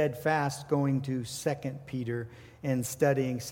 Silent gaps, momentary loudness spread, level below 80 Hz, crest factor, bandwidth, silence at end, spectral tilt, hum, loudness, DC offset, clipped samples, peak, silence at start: none; 9 LU; -64 dBFS; 18 dB; 17 kHz; 0 s; -6 dB/octave; none; -31 LUFS; under 0.1%; under 0.1%; -12 dBFS; 0 s